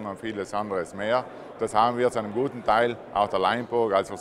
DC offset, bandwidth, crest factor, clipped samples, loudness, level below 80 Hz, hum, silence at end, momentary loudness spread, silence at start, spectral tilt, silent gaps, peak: under 0.1%; 12.5 kHz; 18 dB; under 0.1%; -26 LUFS; -58 dBFS; none; 0 s; 8 LU; 0 s; -5 dB/octave; none; -8 dBFS